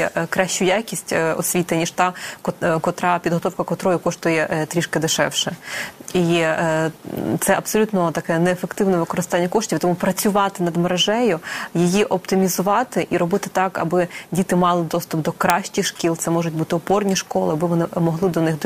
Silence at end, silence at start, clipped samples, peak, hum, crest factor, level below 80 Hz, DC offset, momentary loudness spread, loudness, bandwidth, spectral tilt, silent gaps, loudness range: 0 s; 0 s; under 0.1%; 0 dBFS; none; 20 dB; -56 dBFS; under 0.1%; 5 LU; -20 LUFS; 15 kHz; -4.5 dB/octave; none; 2 LU